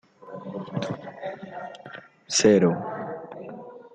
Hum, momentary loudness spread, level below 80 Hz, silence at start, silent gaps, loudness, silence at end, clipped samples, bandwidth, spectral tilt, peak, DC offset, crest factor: none; 23 LU; -68 dBFS; 0.2 s; none; -25 LUFS; 0 s; under 0.1%; 9.4 kHz; -4.5 dB/octave; -8 dBFS; under 0.1%; 20 dB